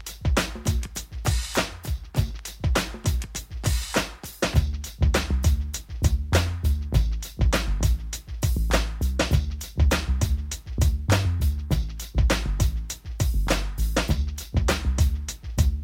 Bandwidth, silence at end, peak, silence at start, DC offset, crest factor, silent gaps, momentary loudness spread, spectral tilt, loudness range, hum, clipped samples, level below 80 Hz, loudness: 16.5 kHz; 0 s; -6 dBFS; 0 s; under 0.1%; 18 dB; none; 7 LU; -5 dB/octave; 3 LU; none; under 0.1%; -26 dBFS; -26 LUFS